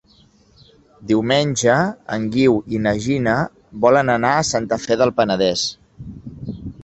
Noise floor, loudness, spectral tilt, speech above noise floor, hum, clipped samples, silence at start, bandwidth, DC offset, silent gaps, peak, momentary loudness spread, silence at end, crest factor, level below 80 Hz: -53 dBFS; -18 LUFS; -4.5 dB/octave; 36 dB; none; under 0.1%; 1 s; 8.4 kHz; under 0.1%; none; 0 dBFS; 17 LU; 0 s; 18 dB; -48 dBFS